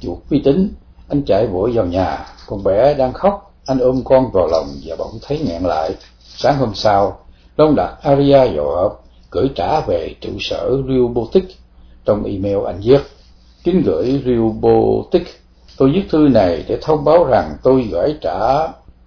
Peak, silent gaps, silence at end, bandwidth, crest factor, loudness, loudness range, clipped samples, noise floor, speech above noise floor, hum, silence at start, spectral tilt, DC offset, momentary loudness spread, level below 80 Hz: 0 dBFS; none; 0.3 s; 5.4 kHz; 16 dB; -16 LUFS; 4 LU; under 0.1%; -44 dBFS; 29 dB; none; 0 s; -8 dB/octave; under 0.1%; 11 LU; -36 dBFS